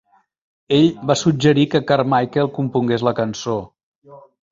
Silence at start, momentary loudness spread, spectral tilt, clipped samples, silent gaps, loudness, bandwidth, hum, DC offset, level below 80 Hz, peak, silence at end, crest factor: 0.7 s; 7 LU; -6 dB/octave; under 0.1%; 3.83-4.02 s; -18 LUFS; 7.8 kHz; none; under 0.1%; -54 dBFS; -2 dBFS; 0.35 s; 18 dB